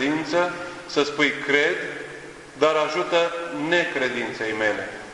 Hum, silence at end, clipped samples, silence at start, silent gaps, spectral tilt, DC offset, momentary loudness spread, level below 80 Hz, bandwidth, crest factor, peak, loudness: none; 0 s; under 0.1%; 0 s; none; -3.5 dB/octave; under 0.1%; 12 LU; -60 dBFS; 11.5 kHz; 20 dB; -4 dBFS; -23 LUFS